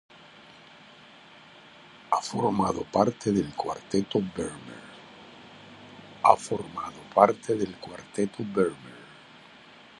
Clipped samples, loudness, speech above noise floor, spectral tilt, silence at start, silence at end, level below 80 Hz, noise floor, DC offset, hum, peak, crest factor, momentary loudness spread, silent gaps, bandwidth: under 0.1%; -27 LUFS; 25 dB; -5.5 dB/octave; 2.1 s; 0.95 s; -60 dBFS; -51 dBFS; under 0.1%; none; -2 dBFS; 28 dB; 25 LU; none; 11.5 kHz